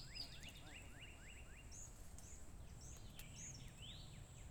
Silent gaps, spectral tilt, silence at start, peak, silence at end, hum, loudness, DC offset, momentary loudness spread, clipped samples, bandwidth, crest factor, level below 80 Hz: none; -3 dB/octave; 0 s; -38 dBFS; 0 s; none; -56 LUFS; under 0.1%; 6 LU; under 0.1%; over 20 kHz; 18 dB; -60 dBFS